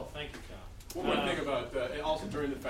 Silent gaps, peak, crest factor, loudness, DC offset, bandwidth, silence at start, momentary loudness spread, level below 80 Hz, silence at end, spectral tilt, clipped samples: none; -18 dBFS; 16 dB; -34 LUFS; under 0.1%; 16 kHz; 0 s; 15 LU; -50 dBFS; 0 s; -5 dB/octave; under 0.1%